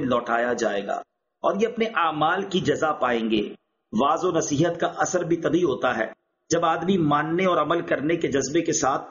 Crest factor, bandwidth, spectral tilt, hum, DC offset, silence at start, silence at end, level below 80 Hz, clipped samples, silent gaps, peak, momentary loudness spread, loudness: 16 dB; 7.2 kHz; -4.5 dB/octave; none; under 0.1%; 0 s; 0 s; -58 dBFS; under 0.1%; none; -8 dBFS; 5 LU; -23 LUFS